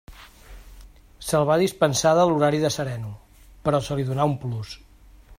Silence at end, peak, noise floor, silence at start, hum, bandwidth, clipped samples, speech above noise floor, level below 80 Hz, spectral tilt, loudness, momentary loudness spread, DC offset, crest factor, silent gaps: 0.05 s; -6 dBFS; -49 dBFS; 0.1 s; none; 16 kHz; under 0.1%; 27 dB; -48 dBFS; -5.5 dB/octave; -22 LUFS; 16 LU; under 0.1%; 18 dB; none